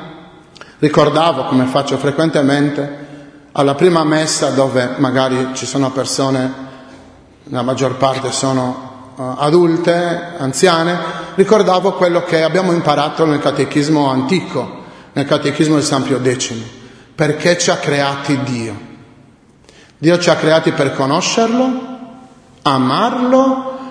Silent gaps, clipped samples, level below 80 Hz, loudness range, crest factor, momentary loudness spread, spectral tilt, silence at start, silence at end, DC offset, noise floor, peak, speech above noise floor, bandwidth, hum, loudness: none; under 0.1%; -54 dBFS; 4 LU; 14 dB; 12 LU; -5 dB/octave; 0 s; 0 s; under 0.1%; -46 dBFS; 0 dBFS; 32 dB; 11 kHz; none; -14 LUFS